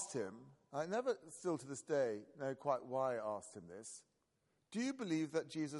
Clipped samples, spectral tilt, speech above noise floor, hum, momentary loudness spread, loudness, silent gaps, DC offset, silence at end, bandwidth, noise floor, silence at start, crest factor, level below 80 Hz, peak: under 0.1%; -5 dB/octave; 41 dB; none; 13 LU; -42 LUFS; none; under 0.1%; 0 s; 11.5 kHz; -82 dBFS; 0 s; 18 dB; -88 dBFS; -24 dBFS